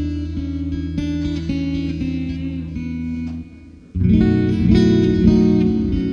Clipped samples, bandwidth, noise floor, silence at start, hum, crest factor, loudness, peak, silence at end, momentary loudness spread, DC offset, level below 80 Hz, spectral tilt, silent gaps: under 0.1%; 7 kHz; -40 dBFS; 0 s; none; 16 dB; -19 LUFS; -2 dBFS; 0 s; 13 LU; under 0.1%; -30 dBFS; -8.5 dB/octave; none